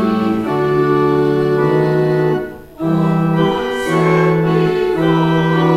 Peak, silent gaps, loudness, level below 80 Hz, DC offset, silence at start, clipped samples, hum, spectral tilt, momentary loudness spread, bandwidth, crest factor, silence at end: -2 dBFS; none; -15 LUFS; -44 dBFS; under 0.1%; 0 s; under 0.1%; none; -8 dB/octave; 4 LU; 13 kHz; 12 dB; 0 s